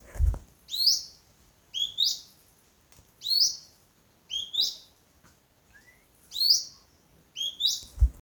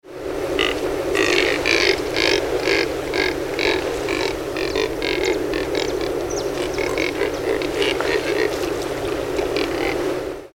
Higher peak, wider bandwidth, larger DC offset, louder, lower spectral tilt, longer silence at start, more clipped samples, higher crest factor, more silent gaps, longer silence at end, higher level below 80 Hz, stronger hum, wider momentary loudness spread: second, -8 dBFS vs 0 dBFS; about the same, over 20 kHz vs over 20 kHz; neither; second, -26 LUFS vs -21 LUFS; second, -1 dB/octave vs -3.5 dB/octave; about the same, 0.1 s vs 0.05 s; neither; about the same, 22 dB vs 22 dB; neither; about the same, 0 s vs 0.05 s; about the same, -38 dBFS vs -40 dBFS; neither; first, 19 LU vs 7 LU